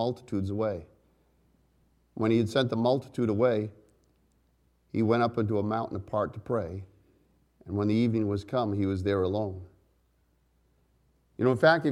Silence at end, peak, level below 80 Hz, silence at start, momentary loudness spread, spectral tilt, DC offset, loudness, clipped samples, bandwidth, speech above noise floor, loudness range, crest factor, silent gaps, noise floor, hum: 0 s; -8 dBFS; -62 dBFS; 0 s; 11 LU; -7.5 dB/octave; under 0.1%; -28 LUFS; under 0.1%; 11.5 kHz; 42 dB; 2 LU; 22 dB; none; -69 dBFS; none